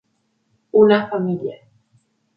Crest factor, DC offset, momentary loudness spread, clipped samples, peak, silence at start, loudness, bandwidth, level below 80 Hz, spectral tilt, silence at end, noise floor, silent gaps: 18 dB; under 0.1%; 13 LU; under 0.1%; -2 dBFS; 0.75 s; -17 LUFS; 5.4 kHz; -64 dBFS; -9.5 dB/octave; 0.8 s; -68 dBFS; none